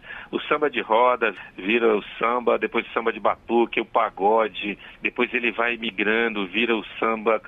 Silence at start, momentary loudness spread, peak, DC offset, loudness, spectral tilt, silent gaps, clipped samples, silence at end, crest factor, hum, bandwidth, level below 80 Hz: 0.05 s; 6 LU; -6 dBFS; under 0.1%; -23 LUFS; -6.5 dB/octave; none; under 0.1%; 0 s; 16 dB; none; 4.1 kHz; -58 dBFS